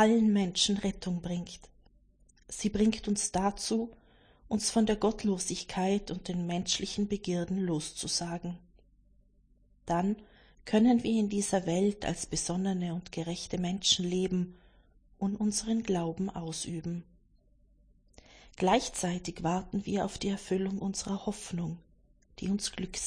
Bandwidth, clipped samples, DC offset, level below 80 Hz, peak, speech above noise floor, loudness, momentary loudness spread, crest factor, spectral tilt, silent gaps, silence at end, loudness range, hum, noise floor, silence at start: 10.5 kHz; under 0.1%; under 0.1%; -54 dBFS; -12 dBFS; 34 dB; -31 LUFS; 11 LU; 20 dB; -4.5 dB/octave; none; 0 s; 5 LU; none; -65 dBFS; 0 s